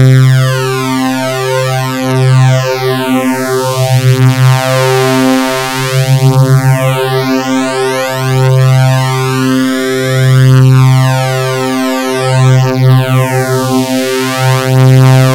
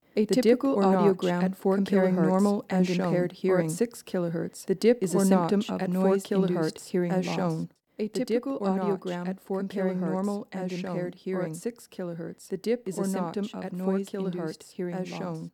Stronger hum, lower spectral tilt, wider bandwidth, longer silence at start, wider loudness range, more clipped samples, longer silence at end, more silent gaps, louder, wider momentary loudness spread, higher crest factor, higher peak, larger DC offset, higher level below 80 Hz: neither; about the same, -6 dB/octave vs -6.5 dB/octave; first, 16.5 kHz vs 14.5 kHz; second, 0 s vs 0.15 s; second, 2 LU vs 7 LU; first, 0.3% vs under 0.1%; about the same, 0 s vs 0.05 s; neither; first, -9 LUFS vs -27 LUFS; second, 6 LU vs 11 LU; second, 8 dB vs 18 dB; first, 0 dBFS vs -8 dBFS; neither; first, -44 dBFS vs -74 dBFS